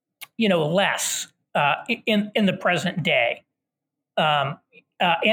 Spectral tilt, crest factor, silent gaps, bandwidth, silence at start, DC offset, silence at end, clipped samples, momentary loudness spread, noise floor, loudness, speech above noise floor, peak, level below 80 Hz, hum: -4 dB/octave; 18 dB; none; 18 kHz; 0.2 s; under 0.1%; 0 s; under 0.1%; 9 LU; -84 dBFS; -22 LUFS; 62 dB; -6 dBFS; -70 dBFS; none